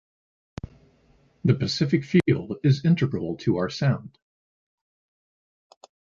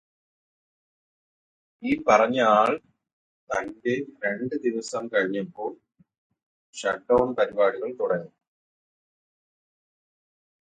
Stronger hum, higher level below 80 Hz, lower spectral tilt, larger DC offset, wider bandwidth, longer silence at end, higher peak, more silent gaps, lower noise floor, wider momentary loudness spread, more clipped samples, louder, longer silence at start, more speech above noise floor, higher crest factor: neither; first, -54 dBFS vs -62 dBFS; first, -7 dB/octave vs -5 dB/octave; neither; second, 7.4 kHz vs 9.4 kHz; second, 2.05 s vs 2.35 s; second, -6 dBFS vs -2 dBFS; second, none vs 3.13-3.47 s, 6.18-6.30 s, 6.43-6.73 s; second, -61 dBFS vs under -90 dBFS; first, 20 LU vs 12 LU; neither; about the same, -24 LUFS vs -25 LUFS; second, 1.45 s vs 1.8 s; second, 38 dB vs over 66 dB; about the same, 20 dB vs 24 dB